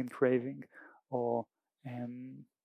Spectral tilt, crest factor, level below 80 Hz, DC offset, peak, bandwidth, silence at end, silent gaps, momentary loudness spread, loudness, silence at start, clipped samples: -9 dB/octave; 22 dB; -88 dBFS; under 0.1%; -16 dBFS; 10.5 kHz; 0.2 s; none; 21 LU; -36 LUFS; 0 s; under 0.1%